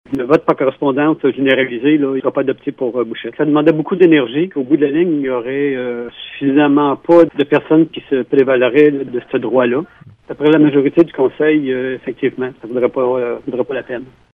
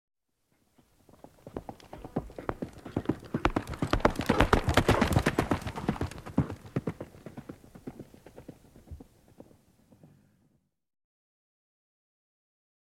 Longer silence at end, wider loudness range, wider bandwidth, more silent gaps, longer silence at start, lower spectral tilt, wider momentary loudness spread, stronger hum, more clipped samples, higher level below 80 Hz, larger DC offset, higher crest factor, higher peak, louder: second, 0.3 s vs 4 s; second, 2 LU vs 21 LU; second, 4.6 kHz vs 16 kHz; neither; second, 0.1 s vs 1.45 s; first, -8.5 dB/octave vs -6 dB/octave; second, 10 LU vs 25 LU; neither; neither; second, -58 dBFS vs -42 dBFS; neither; second, 14 dB vs 32 dB; about the same, 0 dBFS vs -2 dBFS; first, -14 LUFS vs -30 LUFS